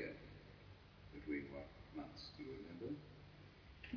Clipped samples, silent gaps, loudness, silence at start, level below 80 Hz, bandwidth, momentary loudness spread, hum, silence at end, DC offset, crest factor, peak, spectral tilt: under 0.1%; none; -53 LUFS; 0 s; -66 dBFS; 5.4 kHz; 15 LU; none; 0 s; under 0.1%; 20 dB; -32 dBFS; -5 dB/octave